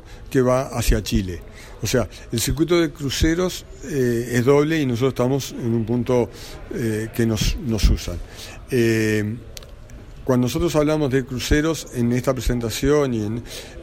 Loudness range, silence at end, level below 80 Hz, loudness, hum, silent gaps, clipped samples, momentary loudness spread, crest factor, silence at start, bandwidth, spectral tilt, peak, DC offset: 3 LU; 0 s; -30 dBFS; -21 LUFS; none; none; under 0.1%; 13 LU; 18 dB; 0.05 s; 16.5 kHz; -5.5 dB/octave; -4 dBFS; under 0.1%